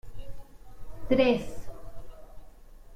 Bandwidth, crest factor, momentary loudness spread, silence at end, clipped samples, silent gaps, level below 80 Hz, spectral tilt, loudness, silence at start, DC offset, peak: 15.5 kHz; 20 dB; 27 LU; 0 s; under 0.1%; none; -44 dBFS; -6 dB/octave; -26 LUFS; 0.05 s; under 0.1%; -10 dBFS